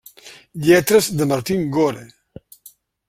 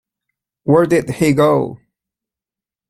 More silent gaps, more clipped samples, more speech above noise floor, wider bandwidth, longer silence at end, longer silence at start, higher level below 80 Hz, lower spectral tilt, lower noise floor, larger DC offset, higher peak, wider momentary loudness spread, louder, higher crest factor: neither; neither; second, 33 dB vs 75 dB; about the same, 16.5 kHz vs 15.5 kHz; second, 1 s vs 1.15 s; second, 0.25 s vs 0.65 s; about the same, -54 dBFS vs -50 dBFS; second, -5 dB/octave vs -7 dB/octave; second, -49 dBFS vs -89 dBFS; neither; about the same, -2 dBFS vs -2 dBFS; about the same, 13 LU vs 11 LU; second, -17 LUFS vs -14 LUFS; about the same, 18 dB vs 16 dB